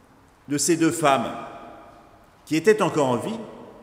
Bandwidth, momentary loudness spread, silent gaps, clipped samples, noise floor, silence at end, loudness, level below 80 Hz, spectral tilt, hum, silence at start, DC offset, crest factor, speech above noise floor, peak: 16 kHz; 20 LU; none; under 0.1%; -52 dBFS; 0 s; -22 LUFS; -62 dBFS; -4.5 dB/octave; none; 0.5 s; under 0.1%; 20 dB; 30 dB; -4 dBFS